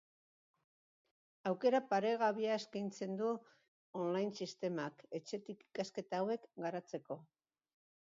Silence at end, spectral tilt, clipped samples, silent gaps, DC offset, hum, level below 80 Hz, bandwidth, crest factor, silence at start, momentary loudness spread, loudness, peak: 0.75 s; -4.5 dB/octave; under 0.1%; 3.68-3.93 s; under 0.1%; none; -90 dBFS; 7.4 kHz; 20 dB; 1.45 s; 12 LU; -40 LUFS; -22 dBFS